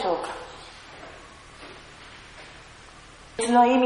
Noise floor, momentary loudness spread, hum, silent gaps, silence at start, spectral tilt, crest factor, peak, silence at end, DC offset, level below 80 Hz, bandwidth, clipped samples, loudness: -47 dBFS; 24 LU; none; none; 0 s; -3.5 dB/octave; 22 dB; -6 dBFS; 0 s; under 0.1%; -56 dBFS; 10.5 kHz; under 0.1%; -24 LUFS